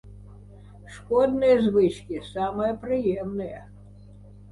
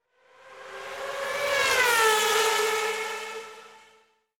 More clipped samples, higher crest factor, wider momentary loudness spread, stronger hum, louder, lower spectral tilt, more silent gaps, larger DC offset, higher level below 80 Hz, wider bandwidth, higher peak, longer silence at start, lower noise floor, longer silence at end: neither; about the same, 16 dB vs 20 dB; about the same, 18 LU vs 19 LU; first, 50 Hz at -45 dBFS vs none; about the same, -24 LUFS vs -24 LUFS; first, -7.5 dB/octave vs 0.5 dB/octave; neither; neither; first, -50 dBFS vs -68 dBFS; second, 11.5 kHz vs 19 kHz; about the same, -10 dBFS vs -8 dBFS; second, 0.05 s vs 0.45 s; second, -47 dBFS vs -62 dBFS; second, 0 s vs 0.6 s